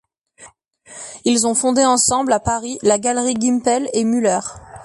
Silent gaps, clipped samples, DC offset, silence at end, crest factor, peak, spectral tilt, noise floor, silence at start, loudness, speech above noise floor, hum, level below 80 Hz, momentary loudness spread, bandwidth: none; under 0.1%; under 0.1%; 0 s; 16 dB; -2 dBFS; -3 dB/octave; -46 dBFS; 0.4 s; -17 LUFS; 29 dB; none; -48 dBFS; 9 LU; 11.5 kHz